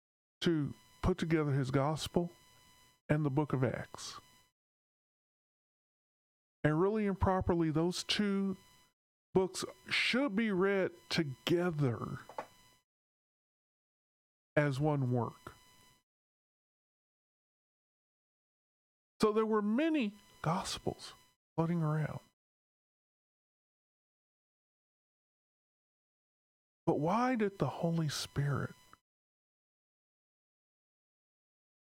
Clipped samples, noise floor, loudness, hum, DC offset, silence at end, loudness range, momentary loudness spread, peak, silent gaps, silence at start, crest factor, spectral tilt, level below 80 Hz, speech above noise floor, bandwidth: under 0.1%; -65 dBFS; -34 LUFS; none; under 0.1%; 3.25 s; 7 LU; 12 LU; -16 dBFS; 3.01-3.09 s, 4.52-6.63 s, 8.93-9.33 s, 12.84-14.56 s, 16.03-19.20 s, 21.36-21.56 s, 22.33-26.87 s; 0.4 s; 20 dB; -6 dB/octave; -60 dBFS; 31 dB; 16 kHz